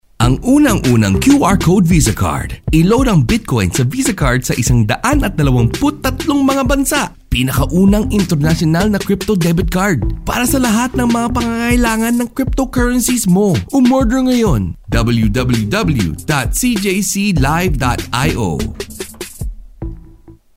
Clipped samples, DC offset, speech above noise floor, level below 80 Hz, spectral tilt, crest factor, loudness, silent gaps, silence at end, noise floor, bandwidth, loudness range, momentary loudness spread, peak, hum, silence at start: under 0.1%; under 0.1%; 28 dB; -24 dBFS; -5.5 dB/octave; 12 dB; -14 LUFS; none; 0.25 s; -40 dBFS; 16.5 kHz; 3 LU; 7 LU; 0 dBFS; none; 0.2 s